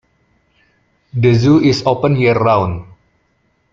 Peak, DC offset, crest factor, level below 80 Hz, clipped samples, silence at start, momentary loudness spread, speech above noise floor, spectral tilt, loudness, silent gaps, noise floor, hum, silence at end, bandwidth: 0 dBFS; under 0.1%; 16 dB; -46 dBFS; under 0.1%; 1.15 s; 12 LU; 49 dB; -7.5 dB/octave; -13 LUFS; none; -61 dBFS; none; 0.9 s; 7.6 kHz